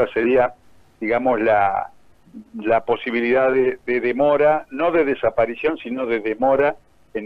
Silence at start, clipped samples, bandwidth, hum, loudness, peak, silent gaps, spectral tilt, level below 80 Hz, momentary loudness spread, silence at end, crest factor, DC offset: 0 s; under 0.1%; 5.4 kHz; none; -19 LUFS; -4 dBFS; none; -7.5 dB/octave; -52 dBFS; 9 LU; 0 s; 16 dB; under 0.1%